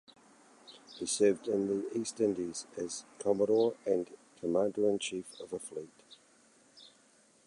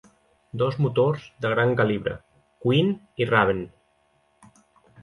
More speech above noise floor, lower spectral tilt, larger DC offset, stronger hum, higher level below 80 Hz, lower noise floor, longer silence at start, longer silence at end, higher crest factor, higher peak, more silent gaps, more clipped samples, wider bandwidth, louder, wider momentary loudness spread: second, 33 dB vs 43 dB; second, -4.5 dB/octave vs -8 dB/octave; neither; neither; second, -74 dBFS vs -56 dBFS; about the same, -65 dBFS vs -65 dBFS; about the same, 0.65 s vs 0.55 s; second, 0.6 s vs 1.35 s; about the same, 18 dB vs 22 dB; second, -16 dBFS vs -4 dBFS; neither; neither; about the same, 11.5 kHz vs 11 kHz; second, -33 LUFS vs -24 LUFS; first, 16 LU vs 11 LU